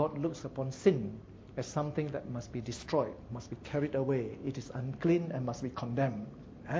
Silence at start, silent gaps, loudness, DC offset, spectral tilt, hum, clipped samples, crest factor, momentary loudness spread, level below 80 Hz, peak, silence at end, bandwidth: 0 s; none; -35 LUFS; under 0.1%; -7 dB/octave; none; under 0.1%; 22 dB; 13 LU; -58 dBFS; -12 dBFS; 0 s; 8 kHz